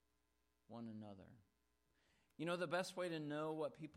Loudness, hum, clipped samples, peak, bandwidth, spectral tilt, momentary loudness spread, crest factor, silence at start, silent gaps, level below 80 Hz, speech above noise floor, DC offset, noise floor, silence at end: -46 LUFS; none; under 0.1%; -30 dBFS; 14 kHz; -5.5 dB/octave; 16 LU; 18 dB; 0.7 s; none; -86 dBFS; 39 dB; under 0.1%; -85 dBFS; 0 s